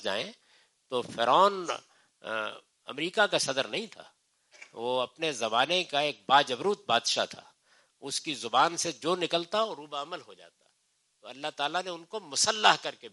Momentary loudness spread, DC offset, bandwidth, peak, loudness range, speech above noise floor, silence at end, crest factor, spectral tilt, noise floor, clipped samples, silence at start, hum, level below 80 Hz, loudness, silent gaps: 16 LU; under 0.1%; 11.5 kHz; -6 dBFS; 5 LU; 44 dB; 0.05 s; 24 dB; -2 dB/octave; -74 dBFS; under 0.1%; 0 s; none; -82 dBFS; -28 LUFS; none